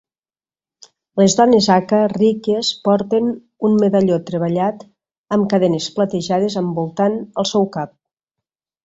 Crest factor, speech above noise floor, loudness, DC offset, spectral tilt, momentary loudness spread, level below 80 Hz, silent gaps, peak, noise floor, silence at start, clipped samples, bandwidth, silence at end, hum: 16 dB; over 74 dB; -17 LUFS; under 0.1%; -5.5 dB/octave; 9 LU; -58 dBFS; 5.18-5.24 s; -2 dBFS; under -90 dBFS; 1.15 s; under 0.1%; 8 kHz; 0.95 s; none